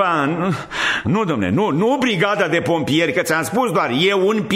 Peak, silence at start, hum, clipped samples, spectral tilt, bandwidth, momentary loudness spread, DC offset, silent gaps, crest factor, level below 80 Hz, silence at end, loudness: -4 dBFS; 0 s; none; under 0.1%; -5 dB/octave; 16 kHz; 3 LU; under 0.1%; none; 14 dB; -52 dBFS; 0 s; -18 LUFS